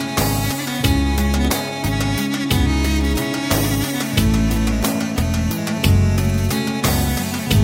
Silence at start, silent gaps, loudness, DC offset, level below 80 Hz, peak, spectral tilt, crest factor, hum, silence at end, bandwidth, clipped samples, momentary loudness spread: 0 s; none; -19 LUFS; under 0.1%; -26 dBFS; -2 dBFS; -5 dB/octave; 16 dB; none; 0 s; 16.5 kHz; under 0.1%; 4 LU